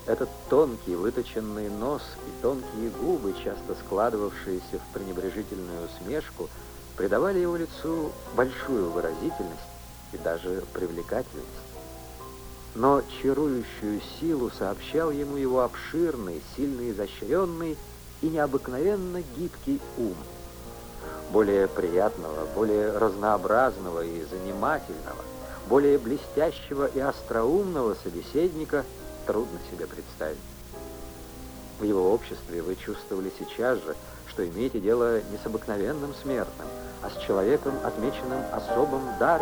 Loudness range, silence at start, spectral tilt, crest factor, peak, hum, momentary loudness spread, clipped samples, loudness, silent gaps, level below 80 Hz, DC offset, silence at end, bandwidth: 5 LU; 0 s; -6 dB/octave; 20 dB; -8 dBFS; none; 15 LU; under 0.1%; -28 LUFS; none; -46 dBFS; under 0.1%; 0 s; over 20 kHz